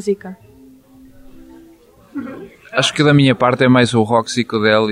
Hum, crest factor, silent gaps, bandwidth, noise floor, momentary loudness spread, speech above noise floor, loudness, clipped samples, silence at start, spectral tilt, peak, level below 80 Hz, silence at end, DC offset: none; 16 dB; none; 11.5 kHz; -46 dBFS; 20 LU; 32 dB; -14 LUFS; under 0.1%; 0 s; -5.5 dB/octave; -2 dBFS; -52 dBFS; 0 s; under 0.1%